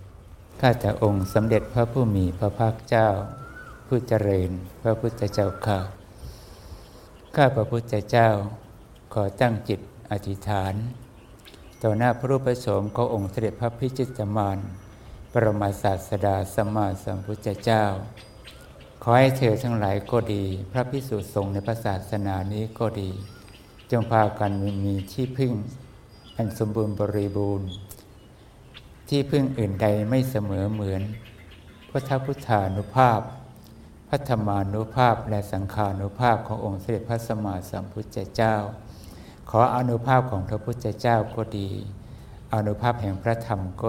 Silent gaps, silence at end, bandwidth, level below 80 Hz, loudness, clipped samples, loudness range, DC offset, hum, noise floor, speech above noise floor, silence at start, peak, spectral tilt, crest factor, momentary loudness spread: none; 0 s; 16.5 kHz; -48 dBFS; -25 LUFS; under 0.1%; 4 LU; under 0.1%; none; -49 dBFS; 25 dB; 0 s; -2 dBFS; -7.5 dB/octave; 22 dB; 18 LU